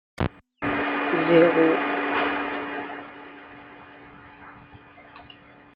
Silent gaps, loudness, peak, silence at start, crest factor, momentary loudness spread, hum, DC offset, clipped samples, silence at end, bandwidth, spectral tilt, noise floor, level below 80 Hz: none; -23 LUFS; -6 dBFS; 0.2 s; 20 dB; 27 LU; none; under 0.1%; under 0.1%; 0.5 s; 5.4 kHz; -8 dB/octave; -49 dBFS; -54 dBFS